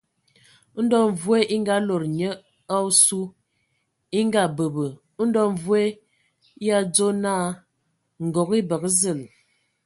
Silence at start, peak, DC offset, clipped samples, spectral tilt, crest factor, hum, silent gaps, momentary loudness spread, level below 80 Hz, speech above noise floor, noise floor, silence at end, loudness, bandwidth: 0.75 s; -4 dBFS; under 0.1%; under 0.1%; -4 dB/octave; 20 dB; none; none; 12 LU; -66 dBFS; 51 dB; -72 dBFS; 0.6 s; -22 LUFS; 12 kHz